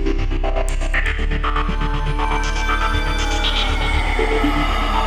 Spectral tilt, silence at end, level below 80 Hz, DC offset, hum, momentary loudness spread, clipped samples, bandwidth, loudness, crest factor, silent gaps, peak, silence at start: -4.5 dB/octave; 0 s; -20 dBFS; under 0.1%; none; 4 LU; under 0.1%; 10 kHz; -20 LUFS; 12 dB; none; -6 dBFS; 0 s